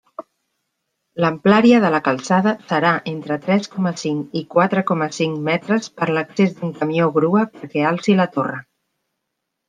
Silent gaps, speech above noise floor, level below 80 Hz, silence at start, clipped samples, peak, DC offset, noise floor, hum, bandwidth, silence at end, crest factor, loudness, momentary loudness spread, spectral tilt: none; 60 dB; -64 dBFS; 0.2 s; under 0.1%; -2 dBFS; under 0.1%; -78 dBFS; none; 9.6 kHz; 1.1 s; 18 dB; -18 LUFS; 9 LU; -6.5 dB/octave